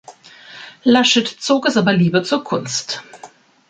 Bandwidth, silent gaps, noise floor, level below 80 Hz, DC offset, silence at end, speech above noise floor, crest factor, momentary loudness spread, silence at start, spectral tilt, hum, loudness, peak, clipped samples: 9.4 kHz; none; -43 dBFS; -62 dBFS; under 0.1%; 0.45 s; 27 dB; 16 dB; 15 LU; 0.1 s; -4.5 dB/octave; none; -16 LUFS; -2 dBFS; under 0.1%